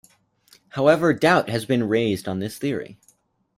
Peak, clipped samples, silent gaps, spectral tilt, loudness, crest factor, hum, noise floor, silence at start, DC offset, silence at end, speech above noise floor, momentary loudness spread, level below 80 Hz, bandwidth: -4 dBFS; under 0.1%; none; -6 dB/octave; -21 LUFS; 18 dB; none; -62 dBFS; 0.75 s; under 0.1%; 0.65 s; 41 dB; 13 LU; -60 dBFS; 16 kHz